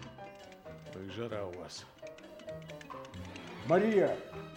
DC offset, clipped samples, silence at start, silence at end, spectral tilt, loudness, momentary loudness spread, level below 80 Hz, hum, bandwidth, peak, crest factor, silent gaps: under 0.1%; under 0.1%; 0 s; 0 s; -6 dB/octave; -35 LUFS; 21 LU; -68 dBFS; none; 16.5 kHz; -16 dBFS; 20 dB; none